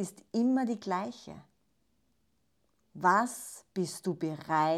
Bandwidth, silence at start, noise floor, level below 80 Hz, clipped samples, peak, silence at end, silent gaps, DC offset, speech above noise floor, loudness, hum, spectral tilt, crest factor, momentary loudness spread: 14.5 kHz; 0 s; -76 dBFS; -76 dBFS; under 0.1%; -12 dBFS; 0 s; none; under 0.1%; 45 dB; -32 LUFS; none; -5 dB/octave; 20 dB; 15 LU